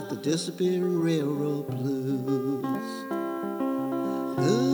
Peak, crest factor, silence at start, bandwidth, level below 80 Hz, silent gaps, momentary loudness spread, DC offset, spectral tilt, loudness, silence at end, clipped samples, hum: -12 dBFS; 16 dB; 0 s; over 20 kHz; -74 dBFS; none; 6 LU; under 0.1%; -6.5 dB/octave; -28 LUFS; 0 s; under 0.1%; none